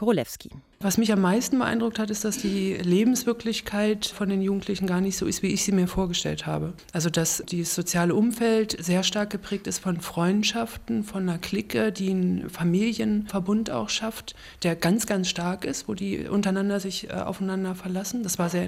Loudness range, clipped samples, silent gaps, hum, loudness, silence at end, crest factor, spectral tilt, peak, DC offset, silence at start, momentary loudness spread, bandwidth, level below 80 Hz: 2 LU; under 0.1%; none; none; -26 LUFS; 0 s; 16 dB; -4.5 dB/octave; -10 dBFS; under 0.1%; 0 s; 8 LU; 16 kHz; -50 dBFS